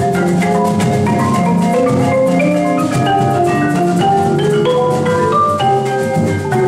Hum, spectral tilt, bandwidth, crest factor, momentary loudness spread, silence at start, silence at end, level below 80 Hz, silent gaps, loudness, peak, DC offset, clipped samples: none; -6.5 dB/octave; 14.5 kHz; 10 dB; 2 LU; 0 s; 0 s; -46 dBFS; none; -13 LUFS; -2 dBFS; under 0.1%; under 0.1%